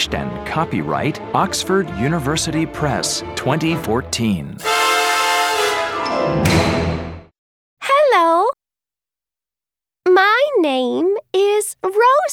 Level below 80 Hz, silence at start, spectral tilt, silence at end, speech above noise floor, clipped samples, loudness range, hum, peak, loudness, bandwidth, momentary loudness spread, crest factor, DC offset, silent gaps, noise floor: -40 dBFS; 0 s; -4 dB/octave; 0 s; over 71 dB; under 0.1%; 3 LU; none; -2 dBFS; -17 LUFS; 19.5 kHz; 8 LU; 16 dB; under 0.1%; 7.38-7.77 s; under -90 dBFS